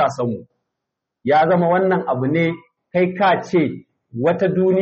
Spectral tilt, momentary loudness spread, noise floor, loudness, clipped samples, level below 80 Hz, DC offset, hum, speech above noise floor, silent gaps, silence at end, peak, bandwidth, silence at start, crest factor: -6 dB/octave; 13 LU; -81 dBFS; -18 LUFS; under 0.1%; -60 dBFS; under 0.1%; none; 64 dB; none; 0 s; -6 dBFS; 7.2 kHz; 0 s; 12 dB